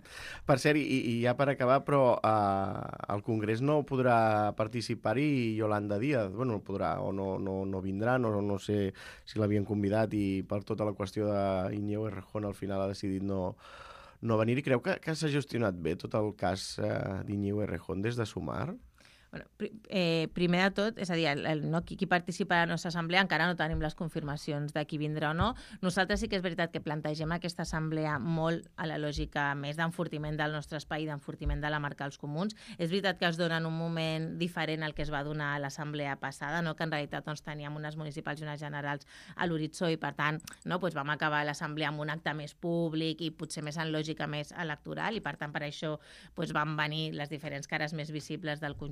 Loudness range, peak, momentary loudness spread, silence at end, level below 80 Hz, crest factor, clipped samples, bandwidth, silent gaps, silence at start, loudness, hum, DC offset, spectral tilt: 6 LU; -10 dBFS; 10 LU; 0 s; -54 dBFS; 22 dB; under 0.1%; 14.5 kHz; none; 0.05 s; -33 LUFS; none; under 0.1%; -6 dB/octave